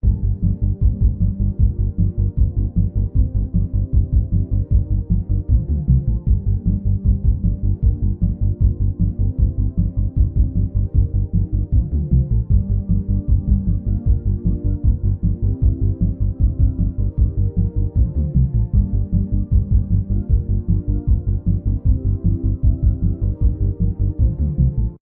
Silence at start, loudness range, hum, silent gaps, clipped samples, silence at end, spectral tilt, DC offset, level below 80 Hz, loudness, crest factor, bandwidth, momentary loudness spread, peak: 0.05 s; 1 LU; none; none; under 0.1%; 0.05 s; -17.5 dB/octave; under 0.1%; -20 dBFS; -20 LUFS; 14 dB; 1.1 kHz; 3 LU; -2 dBFS